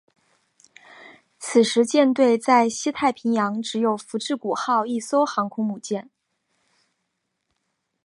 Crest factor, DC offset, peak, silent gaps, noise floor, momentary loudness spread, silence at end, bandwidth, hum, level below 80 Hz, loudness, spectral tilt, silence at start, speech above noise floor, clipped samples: 20 dB; under 0.1%; -4 dBFS; none; -77 dBFS; 10 LU; 2.05 s; 11.5 kHz; none; -72 dBFS; -22 LUFS; -4 dB/octave; 1 s; 56 dB; under 0.1%